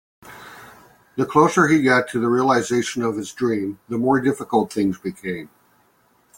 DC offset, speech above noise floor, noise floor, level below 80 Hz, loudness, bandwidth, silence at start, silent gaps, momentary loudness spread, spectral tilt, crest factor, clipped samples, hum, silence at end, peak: under 0.1%; 41 dB; -60 dBFS; -60 dBFS; -20 LUFS; 17 kHz; 0.25 s; none; 17 LU; -5.5 dB/octave; 18 dB; under 0.1%; none; 0.9 s; -2 dBFS